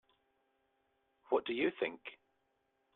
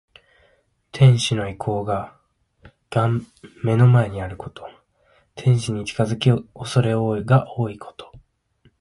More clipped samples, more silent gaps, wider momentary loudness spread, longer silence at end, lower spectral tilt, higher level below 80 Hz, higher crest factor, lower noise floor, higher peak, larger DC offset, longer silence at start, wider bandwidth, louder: neither; neither; second, 17 LU vs 22 LU; first, 0.8 s vs 0.65 s; about the same, -7 dB/octave vs -6.5 dB/octave; second, -82 dBFS vs -50 dBFS; about the same, 22 dB vs 18 dB; first, -80 dBFS vs -62 dBFS; second, -20 dBFS vs -4 dBFS; neither; first, 1.3 s vs 0.95 s; second, 4.3 kHz vs 11.5 kHz; second, -37 LUFS vs -20 LUFS